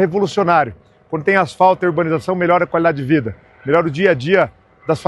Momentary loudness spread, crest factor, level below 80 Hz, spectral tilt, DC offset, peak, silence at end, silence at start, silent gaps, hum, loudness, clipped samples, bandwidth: 9 LU; 16 dB; -52 dBFS; -7 dB/octave; under 0.1%; 0 dBFS; 0 s; 0 s; none; none; -16 LUFS; under 0.1%; 12 kHz